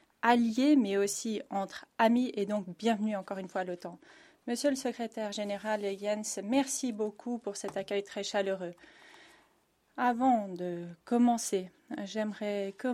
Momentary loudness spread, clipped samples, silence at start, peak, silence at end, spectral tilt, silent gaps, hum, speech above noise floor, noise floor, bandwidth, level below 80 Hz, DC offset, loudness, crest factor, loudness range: 12 LU; under 0.1%; 0.25 s; -12 dBFS; 0 s; -4 dB/octave; none; none; 39 dB; -71 dBFS; 15 kHz; -78 dBFS; under 0.1%; -32 LUFS; 20 dB; 5 LU